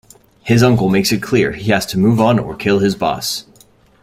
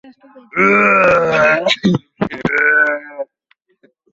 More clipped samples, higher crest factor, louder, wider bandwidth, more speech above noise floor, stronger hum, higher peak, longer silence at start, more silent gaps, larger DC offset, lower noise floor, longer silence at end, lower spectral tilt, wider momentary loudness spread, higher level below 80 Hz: neither; about the same, 14 dB vs 14 dB; about the same, -15 LUFS vs -13 LUFS; first, 16 kHz vs 7.8 kHz; second, 35 dB vs 47 dB; neither; about the same, -2 dBFS vs -2 dBFS; about the same, 0.45 s vs 0.55 s; neither; neither; second, -49 dBFS vs -60 dBFS; second, 0.6 s vs 0.9 s; about the same, -5.5 dB/octave vs -5.5 dB/octave; second, 8 LU vs 14 LU; first, -44 dBFS vs -50 dBFS